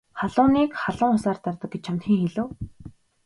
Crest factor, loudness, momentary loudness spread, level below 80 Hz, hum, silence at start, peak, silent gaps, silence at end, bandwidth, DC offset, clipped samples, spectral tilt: 18 dB; -24 LUFS; 13 LU; -50 dBFS; none; 0.15 s; -6 dBFS; none; 0.35 s; 11.5 kHz; under 0.1%; under 0.1%; -7.5 dB/octave